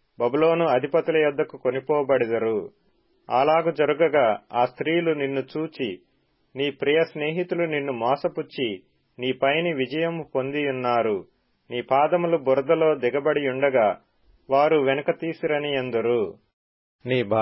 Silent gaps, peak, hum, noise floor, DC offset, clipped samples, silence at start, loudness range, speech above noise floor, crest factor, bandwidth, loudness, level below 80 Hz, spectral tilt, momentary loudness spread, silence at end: 16.53-16.99 s; -8 dBFS; none; -66 dBFS; under 0.1%; under 0.1%; 0.2 s; 4 LU; 43 dB; 16 dB; 5.8 kHz; -23 LUFS; -68 dBFS; -10.5 dB/octave; 10 LU; 0 s